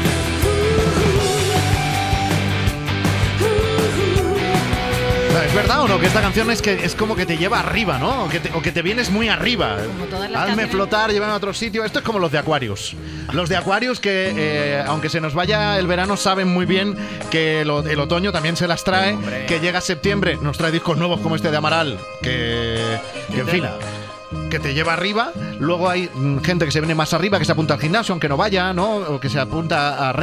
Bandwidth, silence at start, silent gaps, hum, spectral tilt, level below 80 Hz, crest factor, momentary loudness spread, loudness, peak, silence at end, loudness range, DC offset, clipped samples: 16 kHz; 0 s; none; none; -5 dB/octave; -34 dBFS; 16 dB; 5 LU; -19 LUFS; -2 dBFS; 0 s; 3 LU; under 0.1%; under 0.1%